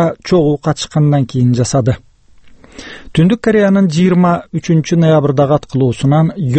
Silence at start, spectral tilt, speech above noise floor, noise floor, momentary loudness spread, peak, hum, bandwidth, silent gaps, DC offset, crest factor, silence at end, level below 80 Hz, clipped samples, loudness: 0 s; -7 dB/octave; 29 dB; -41 dBFS; 6 LU; 0 dBFS; none; 8.8 kHz; none; under 0.1%; 12 dB; 0 s; -42 dBFS; under 0.1%; -12 LUFS